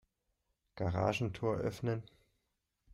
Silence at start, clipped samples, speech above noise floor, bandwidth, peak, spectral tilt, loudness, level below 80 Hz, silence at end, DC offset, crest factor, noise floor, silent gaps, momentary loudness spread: 0.75 s; under 0.1%; 49 dB; 13 kHz; -20 dBFS; -7 dB/octave; -37 LUFS; -62 dBFS; 0 s; under 0.1%; 20 dB; -84 dBFS; none; 6 LU